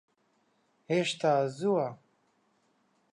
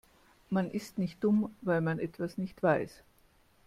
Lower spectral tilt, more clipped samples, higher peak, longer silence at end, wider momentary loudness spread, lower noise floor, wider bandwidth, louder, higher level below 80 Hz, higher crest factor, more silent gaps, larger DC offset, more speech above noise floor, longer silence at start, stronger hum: second, -5.5 dB/octave vs -8 dB/octave; neither; about the same, -16 dBFS vs -14 dBFS; first, 1.2 s vs 0.75 s; second, 4 LU vs 8 LU; first, -72 dBFS vs -65 dBFS; second, 11 kHz vs 14.5 kHz; about the same, -30 LUFS vs -32 LUFS; second, -84 dBFS vs -66 dBFS; about the same, 18 dB vs 20 dB; neither; neither; first, 44 dB vs 34 dB; first, 0.9 s vs 0.5 s; neither